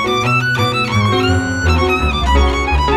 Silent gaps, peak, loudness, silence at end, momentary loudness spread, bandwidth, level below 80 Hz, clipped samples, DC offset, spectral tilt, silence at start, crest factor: none; -2 dBFS; -14 LUFS; 0 s; 2 LU; 13.5 kHz; -20 dBFS; under 0.1%; under 0.1%; -5.5 dB/octave; 0 s; 12 dB